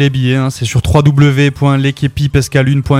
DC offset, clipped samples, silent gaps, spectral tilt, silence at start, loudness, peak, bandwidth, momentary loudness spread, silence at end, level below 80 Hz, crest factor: under 0.1%; under 0.1%; none; -6.5 dB/octave; 0 s; -11 LUFS; 0 dBFS; 13.5 kHz; 5 LU; 0 s; -30 dBFS; 10 dB